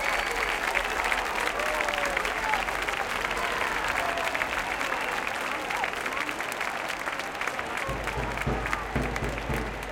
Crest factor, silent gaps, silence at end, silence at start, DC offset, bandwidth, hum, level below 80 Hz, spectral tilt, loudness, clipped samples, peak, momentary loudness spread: 20 dB; none; 0 s; 0 s; under 0.1%; 17 kHz; none; -44 dBFS; -3 dB/octave; -28 LUFS; under 0.1%; -8 dBFS; 4 LU